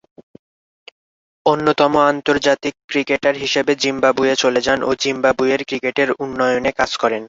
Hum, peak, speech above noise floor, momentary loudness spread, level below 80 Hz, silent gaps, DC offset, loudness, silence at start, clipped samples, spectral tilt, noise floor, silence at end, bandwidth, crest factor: none; -2 dBFS; over 73 dB; 4 LU; -52 dBFS; 2.84-2.88 s; under 0.1%; -17 LUFS; 1.45 s; under 0.1%; -3.5 dB/octave; under -90 dBFS; 0 s; 7.8 kHz; 16 dB